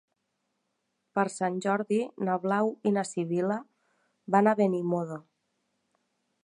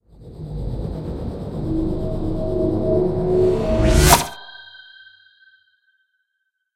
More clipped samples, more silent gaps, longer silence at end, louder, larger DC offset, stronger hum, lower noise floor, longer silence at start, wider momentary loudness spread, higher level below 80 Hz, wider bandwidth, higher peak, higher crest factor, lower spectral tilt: neither; neither; second, 1.25 s vs 2 s; second, -28 LUFS vs -20 LUFS; neither; neither; first, -79 dBFS vs -75 dBFS; first, 1.15 s vs 0.2 s; second, 8 LU vs 22 LU; second, -82 dBFS vs -28 dBFS; second, 11 kHz vs 16 kHz; second, -8 dBFS vs 0 dBFS; about the same, 22 dB vs 22 dB; first, -6.5 dB/octave vs -5 dB/octave